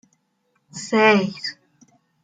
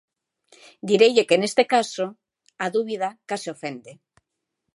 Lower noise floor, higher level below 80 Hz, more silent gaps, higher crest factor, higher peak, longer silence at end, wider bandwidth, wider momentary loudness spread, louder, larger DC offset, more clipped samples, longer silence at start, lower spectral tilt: second, -69 dBFS vs -80 dBFS; first, -70 dBFS vs -76 dBFS; neither; about the same, 20 dB vs 20 dB; about the same, -4 dBFS vs -4 dBFS; about the same, 0.7 s vs 0.8 s; second, 9.2 kHz vs 11.5 kHz; about the same, 19 LU vs 17 LU; first, -19 LUFS vs -22 LUFS; neither; neither; about the same, 0.75 s vs 0.85 s; about the same, -4.5 dB/octave vs -4 dB/octave